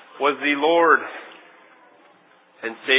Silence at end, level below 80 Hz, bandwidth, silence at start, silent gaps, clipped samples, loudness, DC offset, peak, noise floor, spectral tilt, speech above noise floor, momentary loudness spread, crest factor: 0 s; under -90 dBFS; 4 kHz; 0.15 s; none; under 0.1%; -19 LUFS; under 0.1%; -2 dBFS; -55 dBFS; -6 dB/octave; 35 dB; 18 LU; 20 dB